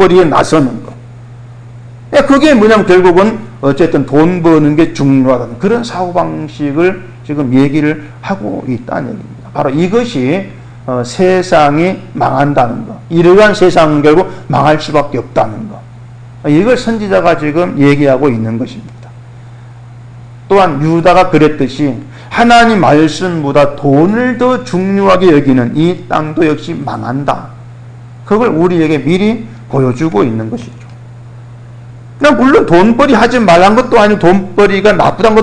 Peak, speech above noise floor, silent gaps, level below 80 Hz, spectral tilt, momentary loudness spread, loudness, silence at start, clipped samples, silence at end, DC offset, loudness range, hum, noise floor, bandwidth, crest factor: 0 dBFS; 22 dB; none; -36 dBFS; -6.5 dB/octave; 12 LU; -9 LUFS; 0 s; 0.6%; 0 s; under 0.1%; 6 LU; none; -31 dBFS; 10 kHz; 10 dB